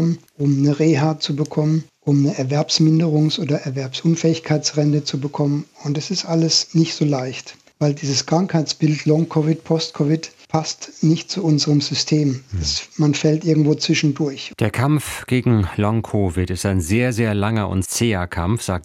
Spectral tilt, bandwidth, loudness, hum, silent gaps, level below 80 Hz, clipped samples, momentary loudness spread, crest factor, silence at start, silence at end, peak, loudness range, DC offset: -5.5 dB/octave; 14 kHz; -19 LUFS; none; none; -48 dBFS; under 0.1%; 6 LU; 16 dB; 0 s; 0 s; -2 dBFS; 2 LU; under 0.1%